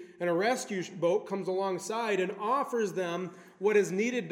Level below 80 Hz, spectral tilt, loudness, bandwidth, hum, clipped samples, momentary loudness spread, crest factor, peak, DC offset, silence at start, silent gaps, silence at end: -86 dBFS; -5 dB/octave; -31 LUFS; 16 kHz; none; under 0.1%; 7 LU; 16 dB; -14 dBFS; under 0.1%; 0 s; none; 0 s